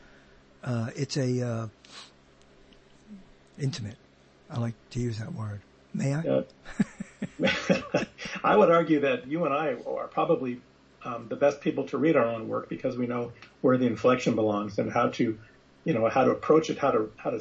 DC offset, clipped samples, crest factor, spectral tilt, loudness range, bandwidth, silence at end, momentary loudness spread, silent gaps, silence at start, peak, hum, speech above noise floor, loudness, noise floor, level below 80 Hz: under 0.1%; under 0.1%; 20 dB; -6.5 dB/octave; 11 LU; 8.6 kHz; 0 s; 15 LU; none; 0.65 s; -8 dBFS; none; 30 dB; -27 LUFS; -57 dBFS; -60 dBFS